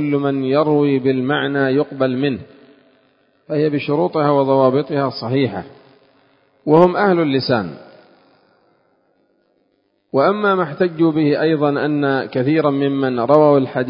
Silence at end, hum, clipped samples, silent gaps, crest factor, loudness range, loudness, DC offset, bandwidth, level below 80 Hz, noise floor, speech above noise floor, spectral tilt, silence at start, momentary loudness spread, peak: 0 s; none; under 0.1%; none; 18 dB; 5 LU; -16 LUFS; under 0.1%; 5.4 kHz; -60 dBFS; -64 dBFS; 48 dB; -10 dB/octave; 0 s; 8 LU; 0 dBFS